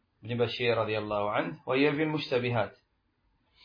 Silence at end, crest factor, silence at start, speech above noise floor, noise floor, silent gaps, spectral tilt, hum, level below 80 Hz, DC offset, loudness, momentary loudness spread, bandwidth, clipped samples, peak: 0.9 s; 18 dB; 0.25 s; 44 dB; -73 dBFS; none; -7.5 dB/octave; none; -66 dBFS; under 0.1%; -30 LUFS; 6 LU; 5.2 kHz; under 0.1%; -12 dBFS